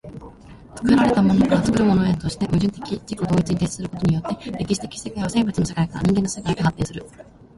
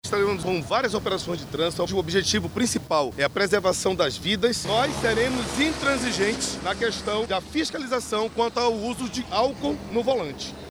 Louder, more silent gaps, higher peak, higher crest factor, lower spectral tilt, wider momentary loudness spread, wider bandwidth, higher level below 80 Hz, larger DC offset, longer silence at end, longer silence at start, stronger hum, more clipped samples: first, -21 LUFS vs -24 LUFS; neither; first, -4 dBFS vs -8 dBFS; about the same, 16 dB vs 18 dB; first, -6.5 dB/octave vs -3.5 dB/octave; first, 12 LU vs 5 LU; second, 11.5 kHz vs over 20 kHz; about the same, -42 dBFS vs -46 dBFS; neither; first, 0.35 s vs 0 s; about the same, 0.05 s vs 0.05 s; neither; neither